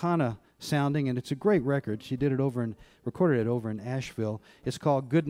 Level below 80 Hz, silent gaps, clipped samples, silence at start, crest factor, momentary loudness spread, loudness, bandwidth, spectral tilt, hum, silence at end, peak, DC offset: -60 dBFS; none; under 0.1%; 0 s; 16 dB; 11 LU; -29 LUFS; 15.5 kHz; -7.5 dB/octave; none; 0 s; -12 dBFS; under 0.1%